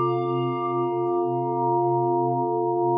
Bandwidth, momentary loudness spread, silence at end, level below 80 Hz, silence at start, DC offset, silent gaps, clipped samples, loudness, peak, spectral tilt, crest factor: 3.7 kHz; 3 LU; 0 s; -84 dBFS; 0 s; under 0.1%; none; under 0.1%; -24 LUFS; -12 dBFS; -12 dB/octave; 10 dB